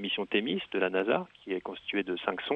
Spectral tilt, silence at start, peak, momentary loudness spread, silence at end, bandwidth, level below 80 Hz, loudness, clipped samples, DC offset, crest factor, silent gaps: -7 dB/octave; 0 s; -12 dBFS; 7 LU; 0 s; 5.6 kHz; -70 dBFS; -31 LUFS; under 0.1%; under 0.1%; 20 dB; none